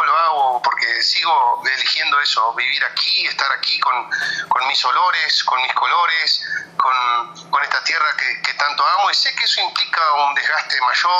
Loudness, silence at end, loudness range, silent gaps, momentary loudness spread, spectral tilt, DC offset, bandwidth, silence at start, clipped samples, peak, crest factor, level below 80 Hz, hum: -16 LUFS; 0 s; 1 LU; none; 4 LU; 1 dB/octave; under 0.1%; 14 kHz; 0 s; under 0.1%; -2 dBFS; 16 dB; -74 dBFS; none